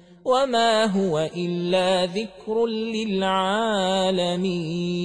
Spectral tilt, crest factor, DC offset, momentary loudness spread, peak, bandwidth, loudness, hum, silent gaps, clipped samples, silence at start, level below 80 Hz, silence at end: -5 dB/octave; 14 dB; 0.1%; 7 LU; -8 dBFS; 10.5 kHz; -23 LUFS; none; none; under 0.1%; 0.1 s; -60 dBFS; 0 s